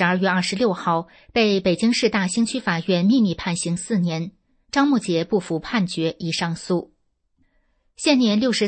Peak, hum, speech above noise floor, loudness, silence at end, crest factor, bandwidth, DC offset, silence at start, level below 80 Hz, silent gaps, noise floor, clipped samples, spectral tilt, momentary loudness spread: -6 dBFS; none; 46 dB; -21 LUFS; 0 s; 16 dB; 8.8 kHz; under 0.1%; 0 s; -56 dBFS; none; -67 dBFS; under 0.1%; -5 dB/octave; 7 LU